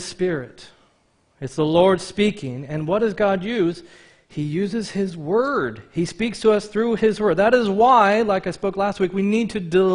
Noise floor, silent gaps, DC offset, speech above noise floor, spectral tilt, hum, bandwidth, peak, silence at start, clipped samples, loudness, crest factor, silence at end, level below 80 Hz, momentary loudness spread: -62 dBFS; none; under 0.1%; 42 dB; -6 dB/octave; none; 10.5 kHz; -4 dBFS; 0 s; under 0.1%; -20 LUFS; 18 dB; 0 s; -52 dBFS; 12 LU